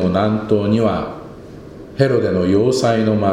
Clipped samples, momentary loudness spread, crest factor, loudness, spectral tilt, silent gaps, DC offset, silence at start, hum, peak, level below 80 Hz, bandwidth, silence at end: under 0.1%; 21 LU; 16 dB; -16 LUFS; -7 dB/octave; none; under 0.1%; 0 s; none; 0 dBFS; -46 dBFS; 12 kHz; 0 s